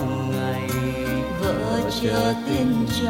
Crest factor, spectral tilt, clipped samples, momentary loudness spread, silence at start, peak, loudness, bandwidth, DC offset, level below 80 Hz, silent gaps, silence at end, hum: 14 dB; -6 dB/octave; under 0.1%; 3 LU; 0 s; -8 dBFS; -23 LUFS; 16.5 kHz; under 0.1%; -40 dBFS; none; 0 s; none